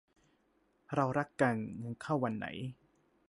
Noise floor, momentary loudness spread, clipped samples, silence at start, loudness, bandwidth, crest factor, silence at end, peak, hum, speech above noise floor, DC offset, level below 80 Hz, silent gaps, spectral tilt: -74 dBFS; 11 LU; under 0.1%; 0.9 s; -35 LUFS; 11.5 kHz; 20 dB; 0.55 s; -16 dBFS; none; 39 dB; under 0.1%; -70 dBFS; none; -7 dB/octave